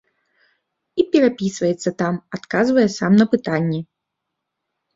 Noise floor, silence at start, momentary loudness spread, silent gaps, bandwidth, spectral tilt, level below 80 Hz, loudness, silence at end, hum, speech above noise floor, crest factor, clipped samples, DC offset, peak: -79 dBFS; 0.95 s; 9 LU; none; 7.8 kHz; -6.5 dB/octave; -60 dBFS; -19 LUFS; 1.15 s; none; 62 dB; 18 dB; under 0.1%; under 0.1%; -2 dBFS